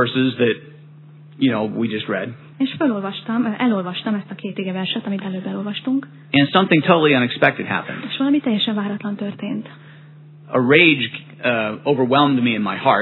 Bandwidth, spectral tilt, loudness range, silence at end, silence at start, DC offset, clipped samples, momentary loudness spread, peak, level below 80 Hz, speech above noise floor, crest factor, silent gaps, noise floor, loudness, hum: 4.3 kHz; -9 dB/octave; 5 LU; 0 s; 0 s; under 0.1%; under 0.1%; 12 LU; 0 dBFS; -68 dBFS; 24 dB; 20 dB; none; -42 dBFS; -19 LUFS; none